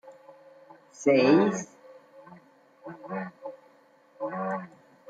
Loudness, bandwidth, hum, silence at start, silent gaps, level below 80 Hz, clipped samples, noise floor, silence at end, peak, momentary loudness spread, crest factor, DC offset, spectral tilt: -26 LUFS; 9 kHz; none; 0.05 s; none; -78 dBFS; under 0.1%; -60 dBFS; 0.45 s; -10 dBFS; 25 LU; 20 dB; under 0.1%; -6 dB/octave